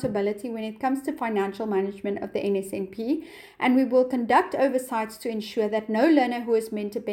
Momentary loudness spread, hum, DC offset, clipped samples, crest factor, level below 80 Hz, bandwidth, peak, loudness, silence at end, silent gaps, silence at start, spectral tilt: 10 LU; none; under 0.1%; under 0.1%; 18 dB; -64 dBFS; 17 kHz; -6 dBFS; -25 LUFS; 0 s; none; 0 s; -6 dB/octave